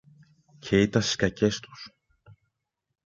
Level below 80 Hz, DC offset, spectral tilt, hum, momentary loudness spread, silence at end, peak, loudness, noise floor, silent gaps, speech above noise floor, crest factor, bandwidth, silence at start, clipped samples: -54 dBFS; under 0.1%; -5 dB/octave; none; 22 LU; 1.2 s; -8 dBFS; -25 LUFS; -81 dBFS; none; 56 dB; 22 dB; 7.6 kHz; 0.65 s; under 0.1%